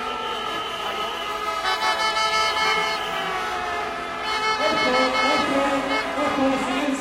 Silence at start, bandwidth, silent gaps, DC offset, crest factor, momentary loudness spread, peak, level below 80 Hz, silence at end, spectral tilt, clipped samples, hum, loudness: 0 s; 16.5 kHz; none; under 0.1%; 16 dB; 7 LU; -8 dBFS; -52 dBFS; 0 s; -2.5 dB/octave; under 0.1%; none; -22 LUFS